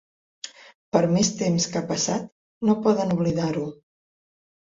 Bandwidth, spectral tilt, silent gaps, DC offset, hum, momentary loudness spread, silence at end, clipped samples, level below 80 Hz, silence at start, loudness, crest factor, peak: 7.8 kHz; -5 dB/octave; 0.75-0.92 s, 2.32-2.61 s; under 0.1%; none; 18 LU; 1 s; under 0.1%; -58 dBFS; 0.45 s; -23 LUFS; 22 dB; -4 dBFS